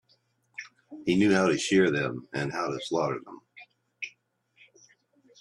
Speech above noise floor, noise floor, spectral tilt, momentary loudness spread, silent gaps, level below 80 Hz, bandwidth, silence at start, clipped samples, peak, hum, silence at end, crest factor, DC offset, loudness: 43 dB; -69 dBFS; -5 dB/octave; 21 LU; none; -66 dBFS; 11.5 kHz; 0.6 s; under 0.1%; -10 dBFS; none; 1.35 s; 20 dB; under 0.1%; -27 LUFS